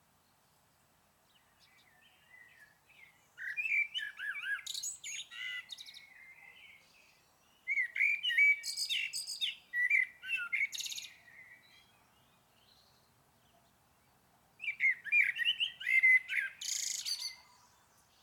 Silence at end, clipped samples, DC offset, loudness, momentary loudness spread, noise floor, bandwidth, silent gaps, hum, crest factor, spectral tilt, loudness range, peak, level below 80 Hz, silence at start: 0.85 s; under 0.1%; under 0.1%; -32 LUFS; 20 LU; -70 dBFS; 19 kHz; none; none; 18 dB; 3.5 dB/octave; 12 LU; -18 dBFS; -84 dBFS; 2.35 s